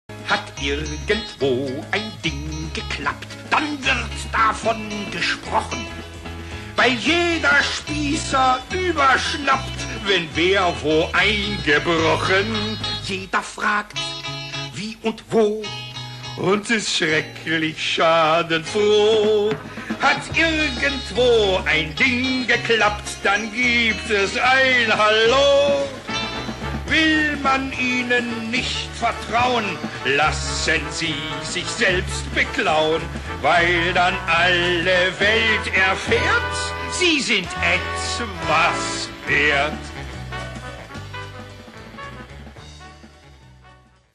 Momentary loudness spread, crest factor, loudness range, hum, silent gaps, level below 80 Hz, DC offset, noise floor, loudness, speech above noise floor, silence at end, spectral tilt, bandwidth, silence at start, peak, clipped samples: 13 LU; 14 dB; 6 LU; none; none; -38 dBFS; under 0.1%; -50 dBFS; -19 LUFS; 30 dB; 0.45 s; -3.5 dB/octave; 13 kHz; 0.1 s; -6 dBFS; under 0.1%